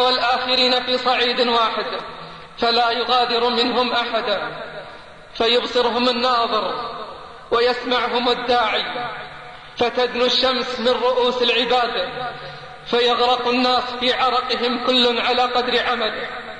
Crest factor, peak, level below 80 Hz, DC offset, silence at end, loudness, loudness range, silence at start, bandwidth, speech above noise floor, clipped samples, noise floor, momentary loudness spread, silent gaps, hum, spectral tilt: 14 dB; -6 dBFS; -52 dBFS; 0.3%; 0 s; -18 LUFS; 3 LU; 0 s; 9.8 kHz; 20 dB; under 0.1%; -40 dBFS; 16 LU; none; none; -3 dB/octave